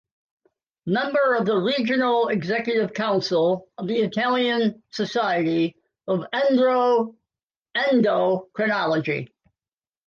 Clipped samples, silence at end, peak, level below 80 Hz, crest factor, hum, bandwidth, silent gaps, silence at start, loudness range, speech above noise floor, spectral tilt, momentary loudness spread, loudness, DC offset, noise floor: under 0.1%; 0.8 s; -10 dBFS; -70 dBFS; 14 dB; none; 7.2 kHz; 7.43-7.48 s; 0.85 s; 1 LU; over 68 dB; -6 dB/octave; 9 LU; -22 LUFS; under 0.1%; under -90 dBFS